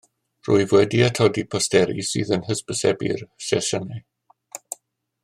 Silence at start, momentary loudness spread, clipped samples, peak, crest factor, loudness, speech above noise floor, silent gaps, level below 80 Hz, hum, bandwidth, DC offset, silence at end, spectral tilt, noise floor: 0.45 s; 18 LU; under 0.1%; -2 dBFS; 20 dB; -21 LUFS; 39 dB; none; -60 dBFS; none; 15 kHz; under 0.1%; 0.5 s; -4.5 dB/octave; -59 dBFS